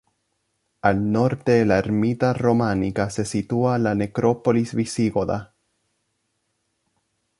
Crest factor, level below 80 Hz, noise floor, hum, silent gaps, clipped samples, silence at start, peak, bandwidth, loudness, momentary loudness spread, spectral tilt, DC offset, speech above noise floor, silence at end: 20 dB; -50 dBFS; -73 dBFS; none; none; under 0.1%; 0.85 s; -2 dBFS; 11.5 kHz; -21 LUFS; 5 LU; -7 dB/octave; under 0.1%; 53 dB; 1.95 s